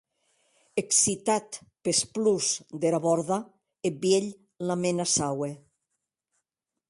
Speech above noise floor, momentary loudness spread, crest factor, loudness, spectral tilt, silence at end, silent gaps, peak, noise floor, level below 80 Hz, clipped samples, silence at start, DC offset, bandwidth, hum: 59 dB; 11 LU; 20 dB; -26 LUFS; -3.5 dB/octave; 1.35 s; none; -10 dBFS; -85 dBFS; -66 dBFS; under 0.1%; 0.75 s; under 0.1%; 11.5 kHz; none